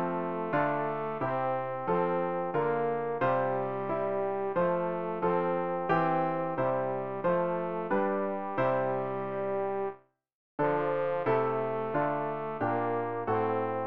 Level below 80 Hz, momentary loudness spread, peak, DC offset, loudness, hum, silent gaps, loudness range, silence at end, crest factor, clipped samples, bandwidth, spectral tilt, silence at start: -66 dBFS; 4 LU; -14 dBFS; 0.3%; -31 LUFS; none; 10.34-10.58 s; 2 LU; 0 s; 16 dB; under 0.1%; 5.4 kHz; -6.5 dB/octave; 0 s